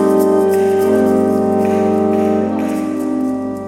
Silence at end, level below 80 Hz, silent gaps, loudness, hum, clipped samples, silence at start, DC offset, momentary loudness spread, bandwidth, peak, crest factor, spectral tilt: 0 s; -56 dBFS; none; -15 LUFS; none; under 0.1%; 0 s; under 0.1%; 6 LU; 16 kHz; 0 dBFS; 14 dB; -7.5 dB/octave